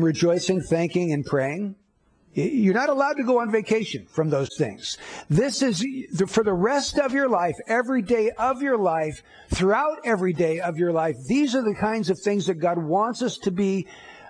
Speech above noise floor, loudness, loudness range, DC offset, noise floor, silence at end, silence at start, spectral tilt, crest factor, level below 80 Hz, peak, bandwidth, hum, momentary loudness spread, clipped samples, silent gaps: 39 dB; -23 LUFS; 1 LU; under 0.1%; -62 dBFS; 0 s; 0 s; -5.5 dB/octave; 16 dB; -50 dBFS; -8 dBFS; 10.5 kHz; none; 7 LU; under 0.1%; none